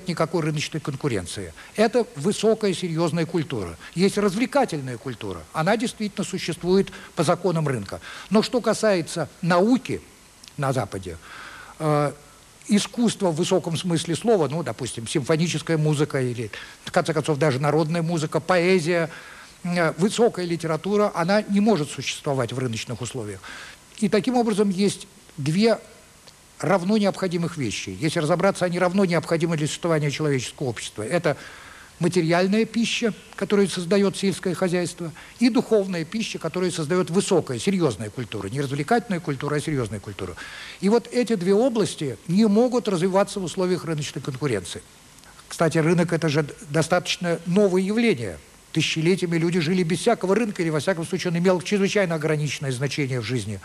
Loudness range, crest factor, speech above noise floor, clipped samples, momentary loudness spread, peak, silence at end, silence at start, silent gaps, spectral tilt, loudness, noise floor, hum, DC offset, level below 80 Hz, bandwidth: 3 LU; 18 dB; 27 dB; under 0.1%; 11 LU; -6 dBFS; 0.05 s; 0 s; none; -5.5 dB/octave; -23 LUFS; -50 dBFS; none; under 0.1%; -56 dBFS; 13.5 kHz